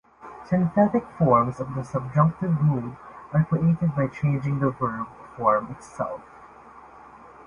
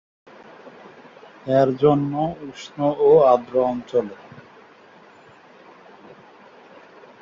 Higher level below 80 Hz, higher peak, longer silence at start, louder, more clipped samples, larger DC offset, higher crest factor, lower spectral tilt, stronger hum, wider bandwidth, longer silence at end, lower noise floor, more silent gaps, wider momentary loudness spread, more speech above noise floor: first, -54 dBFS vs -60 dBFS; about the same, -6 dBFS vs -4 dBFS; second, 0.2 s vs 0.65 s; second, -24 LUFS vs -19 LUFS; neither; neither; about the same, 18 dB vs 20 dB; first, -10 dB/octave vs -8 dB/octave; neither; first, 10 kHz vs 7.4 kHz; second, 0.05 s vs 2.8 s; about the same, -47 dBFS vs -49 dBFS; neither; second, 16 LU vs 21 LU; second, 24 dB vs 30 dB